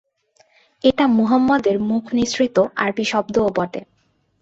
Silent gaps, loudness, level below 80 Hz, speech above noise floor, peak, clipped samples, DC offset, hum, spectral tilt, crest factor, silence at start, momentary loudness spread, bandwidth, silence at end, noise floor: none; -18 LUFS; -52 dBFS; 41 dB; -2 dBFS; under 0.1%; under 0.1%; none; -5 dB/octave; 16 dB; 0.85 s; 5 LU; 8 kHz; 0.6 s; -59 dBFS